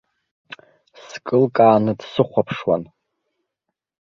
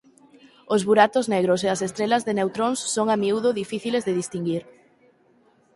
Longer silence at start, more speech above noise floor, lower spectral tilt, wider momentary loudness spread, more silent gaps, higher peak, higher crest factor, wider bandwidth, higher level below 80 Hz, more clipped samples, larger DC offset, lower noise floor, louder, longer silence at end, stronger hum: first, 1.1 s vs 0.7 s; first, 63 dB vs 38 dB; first, -7.5 dB/octave vs -4.5 dB/octave; about the same, 11 LU vs 9 LU; neither; about the same, -2 dBFS vs -4 dBFS; about the same, 20 dB vs 20 dB; second, 7.2 kHz vs 11.5 kHz; first, -60 dBFS vs -66 dBFS; neither; neither; first, -81 dBFS vs -60 dBFS; first, -18 LUFS vs -23 LUFS; first, 1.3 s vs 1.15 s; neither